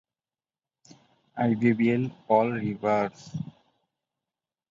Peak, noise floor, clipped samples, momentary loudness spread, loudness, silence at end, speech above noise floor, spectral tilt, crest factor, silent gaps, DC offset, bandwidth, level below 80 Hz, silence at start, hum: -6 dBFS; under -90 dBFS; under 0.1%; 15 LU; -26 LUFS; 1.2 s; over 65 dB; -8 dB/octave; 22 dB; none; under 0.1%; 7.4 kHz; -66 dBFS; 1.35 s; none